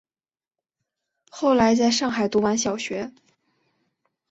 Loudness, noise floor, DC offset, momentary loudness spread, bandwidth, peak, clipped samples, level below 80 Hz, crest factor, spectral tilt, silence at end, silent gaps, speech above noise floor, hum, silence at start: -22 LUFS; under -90 dBFS; under 0.1%; 12 LU; 8.2 kHz; -6 dBFS; under 0.1%; -58 dBFS; 20 dB; -3.5 dB/octave; 1.2 s; none; over 69 dB; none; 1.35 s